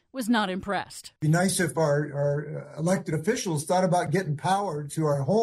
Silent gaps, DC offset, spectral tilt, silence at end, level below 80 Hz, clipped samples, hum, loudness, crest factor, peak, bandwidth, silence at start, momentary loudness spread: none; under 0.1%; -5.5 dB/octave; 0 s; -62 dBFS; under 0.1%; none; -26 LUFS; 14 dB; -12 dBFS; 14 kHz; 0.15 s; 7 LU